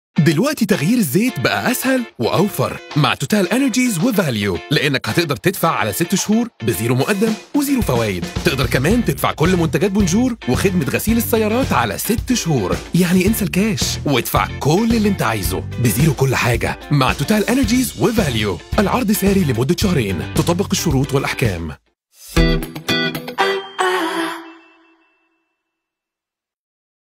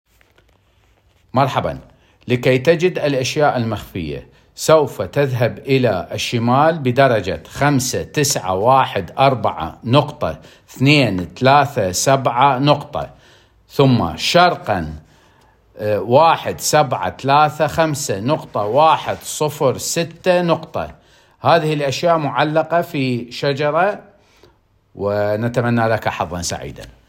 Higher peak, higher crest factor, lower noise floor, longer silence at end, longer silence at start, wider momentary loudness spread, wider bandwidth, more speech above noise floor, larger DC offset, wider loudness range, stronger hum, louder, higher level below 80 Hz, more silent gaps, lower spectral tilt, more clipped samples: about the same, 0 dBFS vs 0 dBFS; about the same, 16 dB vs 18 dB; first, -87 dBFS vs -56 dBFS; first, 2.5 s vs 0.2 s; second, 0.15 s vs 1.35 s; second, 4 LU vs 12 LU; about the same, 16.5 kHz vs 16.5 kHz; first, 70 dB vs 40 dB; neither; about the same, 3 LU vs 4 LU; neither; about the same, -17 LUFS vs -17 LUFS; first, -32 dBFS vs -48 dBFS; neither; about the same, -5 dB/octave vs -5 dB/octave; neither